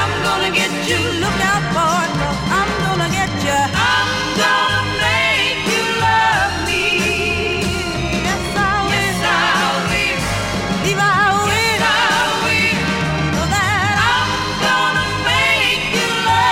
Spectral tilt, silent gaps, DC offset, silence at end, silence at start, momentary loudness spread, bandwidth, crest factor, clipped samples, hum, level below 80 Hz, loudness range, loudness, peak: -3.5 dB/octave; none; under 0.1%; 0 s; 0 s; 5 LU; 16.5 kHz; 12 dB; under 0.1%; none; -34 dBFS; 2 LU; -15 LUFS; -4 dBFS